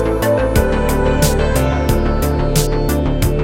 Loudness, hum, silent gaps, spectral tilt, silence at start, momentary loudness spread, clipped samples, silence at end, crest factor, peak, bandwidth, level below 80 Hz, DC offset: -16 LUFS; none; none; -5.5 dB/octave; 0 s; 3 LU; under 0.1%; 0 s; 14 dB; 0 dBFS; 17 kHz; -20 dBFS; 0.8%